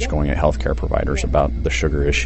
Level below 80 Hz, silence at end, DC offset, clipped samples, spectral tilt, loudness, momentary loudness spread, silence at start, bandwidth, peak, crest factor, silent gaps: -22 dBFS; 0 s; under 0.1%; under 0.1%; -5.5 dB/octave; -20 LUFS; 3 LU; 0 s; 8.4 kHz; -4 dBFS; 16 dB; none